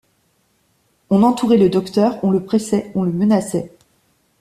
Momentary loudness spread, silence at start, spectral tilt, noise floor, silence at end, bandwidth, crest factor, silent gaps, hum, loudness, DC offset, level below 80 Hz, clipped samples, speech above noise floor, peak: 8 LU; 1.1 s; -7 dB/octave; -62 dBFS; 0.75 s; 13.5 kHz; 16 dB; none; none; -17 LUFS; under 0.1%; -56 dBFS; under 0.1%; 47 dB; -2 dBFS